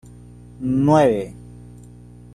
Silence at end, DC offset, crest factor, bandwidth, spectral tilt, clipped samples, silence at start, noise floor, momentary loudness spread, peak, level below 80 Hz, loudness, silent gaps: 0.95 s; under 0.1%; 18 dB; 12.5 kHz; -8 dB/octave; under 0.1%; 0.6 s; -42 dBFS; 19 LU; -2 dBFS; -46 dBFS; -18 LUFS; none